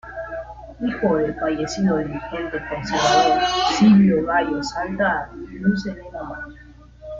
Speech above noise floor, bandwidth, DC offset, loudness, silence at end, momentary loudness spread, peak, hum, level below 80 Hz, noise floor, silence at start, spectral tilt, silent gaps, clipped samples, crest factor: 25 dB; 7.6 kHz; under 0.1%; -20 LUFS; 0 s; 18 LU; -4 dBFS; none; -44 dBFS; -45 dBFS; 0.05 s; -5.5 dB/octave; none; under 0.1%; 16 dB